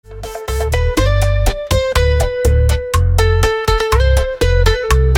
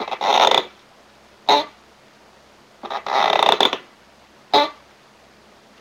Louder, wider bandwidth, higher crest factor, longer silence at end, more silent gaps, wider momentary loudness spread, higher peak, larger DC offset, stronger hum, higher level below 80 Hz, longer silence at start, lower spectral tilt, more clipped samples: first, -15 LUFS vs -18 LUFS; about the same, 17.5 kHz vs 17 kHz; second, 12 dB vs 22 dB; second, 0 s vs 1.1 s; neither; second, 4 LU vs 16 LU; about the same, 0 dBFS vs 0 dBFS; neither; neither; first, -16 dBFS vs -64 dBFS; about the same, 0.1 s vs 0 s; first, -5 dB/octave vs -1.5 dB/octave; neither